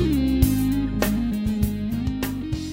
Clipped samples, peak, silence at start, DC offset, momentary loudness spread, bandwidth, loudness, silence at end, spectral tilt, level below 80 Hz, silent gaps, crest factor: under 0.1%; -4 dBFS; 0 s; under 0.1%; 7 LU; 16.5 kHz; -23 LUFS; 0 s; -6.5 dB/octave; -30 dBFS; none; 18 dB